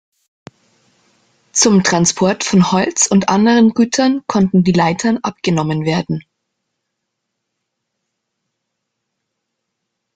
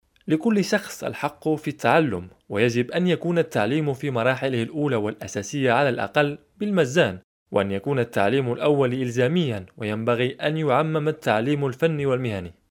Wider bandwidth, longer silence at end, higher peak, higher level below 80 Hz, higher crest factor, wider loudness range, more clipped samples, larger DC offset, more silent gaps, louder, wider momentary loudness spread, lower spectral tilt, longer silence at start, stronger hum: second, 9.6 kHz vs 18 kHz; first, 3.95 s vs 0.2 s; first, 0 dBFS vs -4 dBFS; first, -54 dBFS vs -62 dBFS; about the same, 16 dB vs 20 dB; first, 11 LU vs 1 LU; neither; neither; second, none vs 7.24-7.46 s; first, -14 LUFS vs -23 LUFS; about the same, 7 LU vs 8 LU; second, -4.5 dB/octave vs -6 dB/octave; first, 1.55 s vs 0.25 s; neither